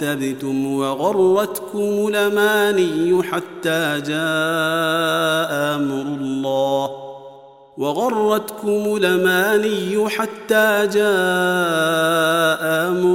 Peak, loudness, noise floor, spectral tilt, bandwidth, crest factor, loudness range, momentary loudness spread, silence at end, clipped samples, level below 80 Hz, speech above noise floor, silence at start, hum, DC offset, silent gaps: -2 dBFS; -18 LUFS; -43 dBFS; -4.5 dB/octave; 16.5 kHz; 16 dB; 4 LU; 7 LU; 0 s; under 0.1%; -70 dBFS; 24 dB; 0 s; none; 0.1%; none